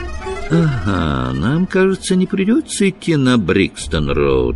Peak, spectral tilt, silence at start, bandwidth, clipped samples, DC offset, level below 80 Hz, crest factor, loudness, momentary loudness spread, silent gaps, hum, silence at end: -2 dBFS; -6 dB/octave; 0 s; 11.5 kHz; under 0.1%; under 0.1%; -30 dBFS; 14 dB; -16 LUFS; 4 LU; none; none; 0 s